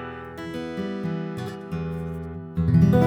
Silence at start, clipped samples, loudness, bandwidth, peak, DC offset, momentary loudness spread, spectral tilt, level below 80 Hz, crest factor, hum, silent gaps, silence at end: 0 s; under 0.1%; -27 LUFS; 8 kHz; -8 dBFS; under 0.1%; 14 LU; -9 dB/octave; -42 dBFS; 18 dB; none; none; 0 s